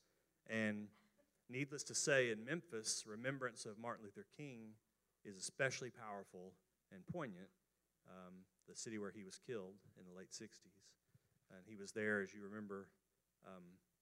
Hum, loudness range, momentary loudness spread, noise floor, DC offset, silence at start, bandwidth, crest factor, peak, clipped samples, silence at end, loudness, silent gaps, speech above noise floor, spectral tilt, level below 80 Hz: none; 11 LU; 21 LU; -79 dBFS; under 0.1%; 0.45 s; 15.5 kHz; 26 dB; -24 dBFS; under 0.1%; 0.25 s; -46 LUFS; none; 31 dB; -3.5 dB/octave; -90 dBFS